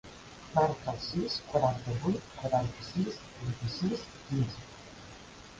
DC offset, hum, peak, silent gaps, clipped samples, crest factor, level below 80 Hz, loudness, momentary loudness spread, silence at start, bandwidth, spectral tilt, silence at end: under 0.1%; none; -12 dBFS; none; under 0.1%; 22 dB; -56 dBFS; -33 LUFS; 19 LU; 0.05 s; 9.4 kHz; -6.5 dB/octave; 0 s